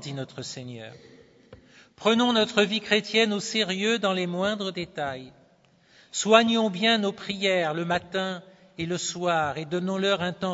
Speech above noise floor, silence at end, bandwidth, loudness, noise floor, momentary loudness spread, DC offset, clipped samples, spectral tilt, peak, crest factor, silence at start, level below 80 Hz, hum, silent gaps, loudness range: 35 dB; 0 s; 8 kHz; -25 LUFS; -60 dBFS; 14 LU; under 0.1%; under 0.1%; -4 dB/octave; -2 dBFS; 24 dB; 0 s; -66 dBFS; none; none; 3 LU